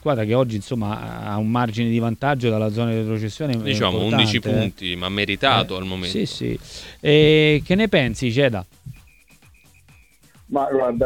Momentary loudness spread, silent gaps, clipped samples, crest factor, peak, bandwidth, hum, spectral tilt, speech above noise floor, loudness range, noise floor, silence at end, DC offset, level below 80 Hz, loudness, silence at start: 10 LU; none; under 0.1%; 20 dB; -2 dBFS; 16.5 kHz; none; -6 dB/octave; 32 dB; 4 LU; -52 dBFS; 0 s; 0.1%; -46 dBFS; -20 LUFS; 0.05 s